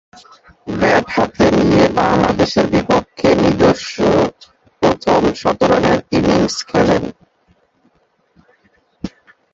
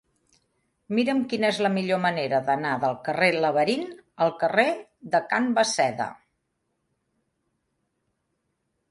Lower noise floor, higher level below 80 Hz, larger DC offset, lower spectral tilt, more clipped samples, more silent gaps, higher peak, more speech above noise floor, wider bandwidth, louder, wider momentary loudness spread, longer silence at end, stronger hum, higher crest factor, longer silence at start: second, -59 dBFS vs -76 dBFS; first, -38 dBFS vs -72 dBFS; neither; first, -6 dB/octave vs -4.5 dB/octave; neither; neither; first, 0 dBFS vs -4 dBFS; second, 45 dB vs 53 dB; second, 8 kHz vs 11.5 kHz; first, -14 LUFS vs -24 LUFS; first, 9 LU vs 6 LU; second, 0.45 s vs 2.75 s; neither; second, 16 dB vs 22 dB; second, 0.65 s vs 0.9 s